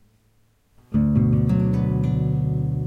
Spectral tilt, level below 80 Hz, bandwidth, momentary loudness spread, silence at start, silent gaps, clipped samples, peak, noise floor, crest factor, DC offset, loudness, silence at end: -11 dB/octave; -36 dBFS; 4.2 kHz; 4 LU; 0.9 s; none; under 0.1%; -8 dBFS; -61 dBFS; 14 dB; under 0.1%; -21 LUFS; 0 s